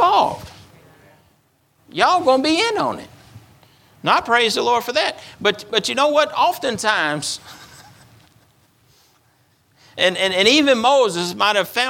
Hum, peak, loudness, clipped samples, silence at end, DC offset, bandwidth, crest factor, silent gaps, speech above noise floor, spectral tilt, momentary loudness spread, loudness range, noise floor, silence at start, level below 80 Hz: none; 0 dBFS; -17 LUFS; under 0.1%; 0 s; under 0.1%; 18.5 kHz; 18 dB; none; 43 dB; -2.5 dB/octave; 10 LU; 7 LU; -60 dBFS; 0 s; -60 dBFS